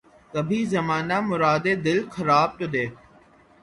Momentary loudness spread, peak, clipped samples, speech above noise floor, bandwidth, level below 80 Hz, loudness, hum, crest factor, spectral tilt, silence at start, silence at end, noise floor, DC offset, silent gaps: 8 LU; -6 dBFS; under 0.1%; 31 dB; 11.5 kHz; -58 dBFS; -23 LUFS; none; 18 dB; -6 dB/octave; 0.35 s; 0.65 s; -54 dBFS; under 0.1%; none